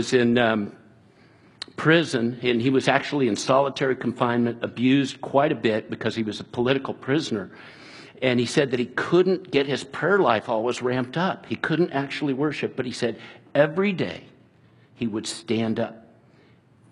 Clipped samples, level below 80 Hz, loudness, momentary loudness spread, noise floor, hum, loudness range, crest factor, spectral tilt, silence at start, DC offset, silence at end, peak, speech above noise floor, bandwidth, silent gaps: under 0.1%; -64 dBFS; -24 LUFS; 10 LU; -56 dBFS; none; 4 LU; 22 dB; -5.5 dB/octave; 0 s; under 0.1%; 0.95 s; -2 dBFS; 33 dB; 11.5 kHz; none